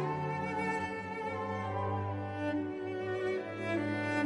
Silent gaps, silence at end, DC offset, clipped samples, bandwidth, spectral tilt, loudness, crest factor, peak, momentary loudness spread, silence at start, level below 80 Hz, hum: none; 0 s; under 0.1%; under 0.1%; 10.5 kHz; -7 dB/octave; -36 LUFS; 16 dB; -20 dBFS; 4 LU; 0 s; -68 dBFS; none